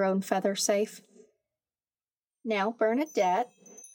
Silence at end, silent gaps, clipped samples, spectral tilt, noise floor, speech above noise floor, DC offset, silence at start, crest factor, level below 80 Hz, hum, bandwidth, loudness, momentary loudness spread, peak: 0.05 s; none; under 0.1%; -4 dB/octave; under -90 dBFS; over 62 dB; under 0.1%; 0 s; 18 dB; under -90 dBFS; none; 17 kHz; -29 LUFS; 11 LU; -12 dBFS